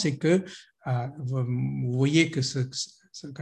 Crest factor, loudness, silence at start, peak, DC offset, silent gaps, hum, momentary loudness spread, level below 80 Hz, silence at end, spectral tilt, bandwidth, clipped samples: 20 dB; -27 LUFS; 0 s; -6 dBFS; under 0.1%; none; none; 16 LU; -64 dBFS; 0 s; -5.5 dB/octave; 10 kHz; under 0.1%